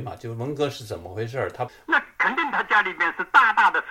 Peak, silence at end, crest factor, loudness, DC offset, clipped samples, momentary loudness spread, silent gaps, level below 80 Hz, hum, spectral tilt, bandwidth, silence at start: -2 dBFS; 0 s; 20 dB; -22 LUFS; under 0.1%; under 0.1%; 15 LU; none; -60 dBFS; none; -4.5 dB/octave; 16.5 kHz; 0 s